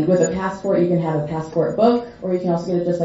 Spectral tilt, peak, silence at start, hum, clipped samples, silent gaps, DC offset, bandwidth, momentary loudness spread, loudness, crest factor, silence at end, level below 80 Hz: -7 dB/octave; -2 dBFS; 0 s; none; under 0.1%; none; under 0.1%; 7.8 kHz; 6 LU; -20 LUFS; 16 dB; 0 s; -52 dBFS